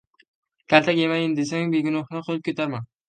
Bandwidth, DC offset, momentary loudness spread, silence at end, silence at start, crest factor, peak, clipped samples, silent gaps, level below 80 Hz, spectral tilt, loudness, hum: 9.2 kHz; under 0.1%; 10 LU; 0.25 s; 0.7 s; 22 dB; -2 dBFS; under 0.1%; none; -70 dBFS; -5.5 dB/octave; -23 LUFS; none